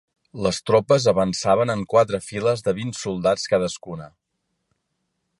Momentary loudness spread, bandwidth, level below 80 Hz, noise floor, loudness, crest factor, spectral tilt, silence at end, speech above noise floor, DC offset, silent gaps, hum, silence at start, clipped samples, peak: 11 LU; 11.5 kHz; -52 dBFS; -76 dBFS; -21 LUFS; 18 dB; -5 dB/octave; 1.3 s; 55 dB; under 0.1%; none; none; 0.35 s; under 0.1%; -4 dBFS